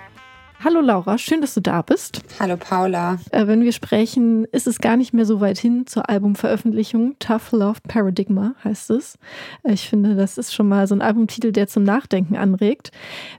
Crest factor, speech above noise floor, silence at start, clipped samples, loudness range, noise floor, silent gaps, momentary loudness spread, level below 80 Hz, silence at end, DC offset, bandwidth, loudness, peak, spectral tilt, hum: 16 dB; 27 dB; 0 s; under 0.1%; 3 LU; -45 dBFS; none; 7 LU; -60 dBFS; 0 s; under 0.1%; 16.5 kHz; -19 LUFS; -2 dBFS; -6 dB/octave; none